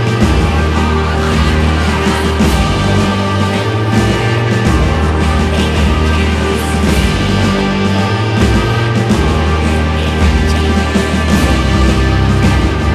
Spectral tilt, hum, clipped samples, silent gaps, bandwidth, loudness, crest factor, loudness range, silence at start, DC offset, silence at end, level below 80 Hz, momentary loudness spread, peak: -6 dB/octave; none; under 0.1%; none; 14 kHz; -12 LUFS; 12 dB; 0 LU; 0 s; under 0.1%; 0 s; -16 dBFS; 2 LU; 0 dBFS